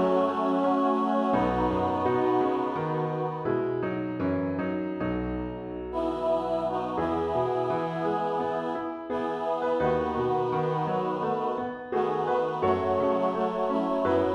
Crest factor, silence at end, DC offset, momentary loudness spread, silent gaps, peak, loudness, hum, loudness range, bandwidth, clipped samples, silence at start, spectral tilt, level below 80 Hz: 16 dB; 0 s; under 0.1%; 6 LU; none; -12 dBFS; -28 LUFS; none; 3 LU; 9.6 kHz; under 0.1%; 0 s; -8 dB/octave; -52 dBFS